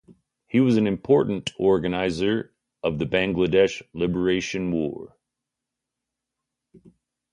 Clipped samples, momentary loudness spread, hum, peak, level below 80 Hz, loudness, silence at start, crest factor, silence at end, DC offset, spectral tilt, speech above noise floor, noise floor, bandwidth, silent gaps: under 0.1%; 9 LU; 60 Hz at -55 dBFS; -6 dBFS; -52 dBFS; -23 LUFS; 0.1 s; 18 dB; 0.55 s; under 0.1%; -6.5 dB/octave; 63 dB; -85 dBFS; 10.5 kHz; none